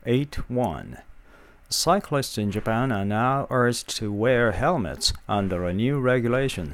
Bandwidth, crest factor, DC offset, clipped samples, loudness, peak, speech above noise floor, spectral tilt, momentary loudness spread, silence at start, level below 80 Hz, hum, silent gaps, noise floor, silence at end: 16.5 kHz; 18 dB; under 0.1%; under 0.1%; -24 LUFS; -8 dBFS; 26 dB; -5 dB/octave; 6 LU; 0.05 s; -42 dBFS; none; none; -50 dBFS; 0 s